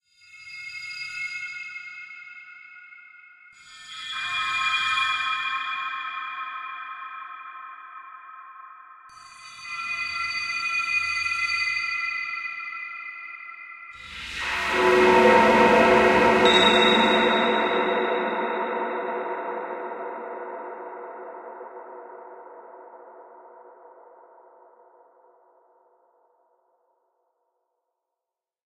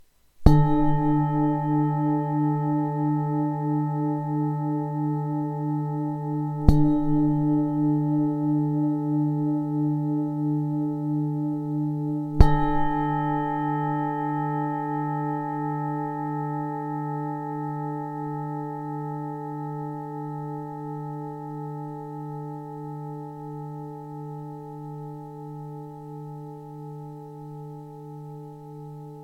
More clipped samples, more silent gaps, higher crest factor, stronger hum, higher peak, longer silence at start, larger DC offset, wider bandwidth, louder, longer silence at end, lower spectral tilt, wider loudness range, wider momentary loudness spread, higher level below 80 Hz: neither; neither; second, 20 dB vs 26 dB; neither; second, -6 dBFS vs 0 dBFS; about the same, 0.35 s vs 0.4 s; neither; first, 14 kHz vs 4.9 kHz; first, -22 LUFS vs -26 LUFS; first, 5.05 s vs 0 s; second, -3.5 dB/octave vs -10 dB/octave; first, 20 LU vs 14 LU; first, 26 LU vs 17 LU; second, -56 dBFS vs -34 dBFS